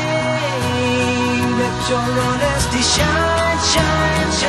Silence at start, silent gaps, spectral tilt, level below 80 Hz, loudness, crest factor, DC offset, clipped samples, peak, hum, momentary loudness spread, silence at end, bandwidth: 0 s; none; -4 dB/octave; -30 dBFS; -16 LUFS; 14 dB; under 0.1%; under 0.1%; -2 dBFS; none; 4 LU; 0 s; 13 kHz